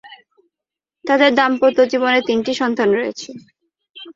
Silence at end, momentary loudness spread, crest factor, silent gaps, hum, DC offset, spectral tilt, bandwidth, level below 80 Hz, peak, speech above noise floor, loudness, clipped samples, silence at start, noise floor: 0.05 s; 18 LU; 18 dB; 3.90-3.94 s; none; under 0.1%; -4 dB/octave; 7.6 kHz; -64 dBFS; 0 dBFS; 70 dB; -16 LUFS; under 0.1%; 0.05 s; -86 dBFS